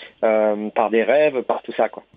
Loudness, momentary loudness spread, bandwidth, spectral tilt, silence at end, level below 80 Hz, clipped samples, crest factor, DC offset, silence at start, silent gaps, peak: -19 LUFS; 7 LU; 4.8 kHz; -9 dB/octave; 0.15 s; -70 dBFS; under 0.1%; 16 dB; under 0.1%; 0 s; none; -4 dBFS